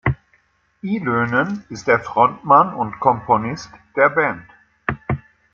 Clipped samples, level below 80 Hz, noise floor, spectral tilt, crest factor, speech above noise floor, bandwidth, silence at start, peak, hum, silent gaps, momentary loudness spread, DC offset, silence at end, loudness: under 0.1%; -46 dBFS; -60 dBFS; -7 dB/octave; 18 dB; 42 dB; 7.4 kHz; 0.05 s; -2 dBFS; none; none; 14 LU; under 0.1%; 0.35 s; -19 LUFS